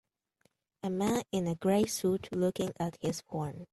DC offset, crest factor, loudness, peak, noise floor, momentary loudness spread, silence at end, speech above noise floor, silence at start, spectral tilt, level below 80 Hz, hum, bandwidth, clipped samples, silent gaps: under 0.1%; 16 dB; -33 LUFS; -18 dBFS; -74 dBFS; 9 LU; 0.1 s; 42 dB; 0.85 s; -5.5 dB/octave; -64 dBFS; none; 14 kHz; under 0.1%; none